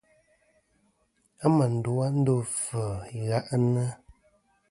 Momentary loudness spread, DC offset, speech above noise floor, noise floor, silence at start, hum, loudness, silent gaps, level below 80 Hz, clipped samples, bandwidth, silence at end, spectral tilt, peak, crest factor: 9 LU; under 0.1%; 44 dB; -70 dBFS; 1.4 s; none; -27 LUFS; none; -58 dBFS; under 0.1%; 11.5 kHz; 0.75 s; -7 dB/octave; -8 dBFS; 20 dB